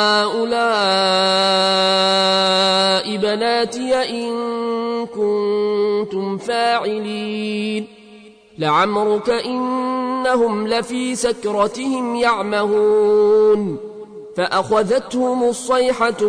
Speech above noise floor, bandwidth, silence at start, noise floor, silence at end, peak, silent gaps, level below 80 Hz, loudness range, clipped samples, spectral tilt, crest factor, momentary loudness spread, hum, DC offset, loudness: 26 dB; 11 kHz; 0 s; -43 dBFS; 0 s; -4 dBFS; none; -58 dBFS; 5 LU; under 0.1%; -3.5 dB/octave; 14 dB; 9 LU; none; under 0.1%; -17 LUFS